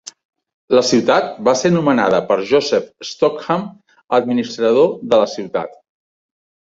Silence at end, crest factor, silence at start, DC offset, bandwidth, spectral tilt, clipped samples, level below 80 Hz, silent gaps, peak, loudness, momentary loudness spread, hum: 0.9 s; 16 dB; 0.7 s; under 0.1%; 7.8 kHz; -5 dB/octave; under 0.1%; -58 dBFS; 4.04-4.08 s; -2 dBFS; -16 LUFS; 10 LU; none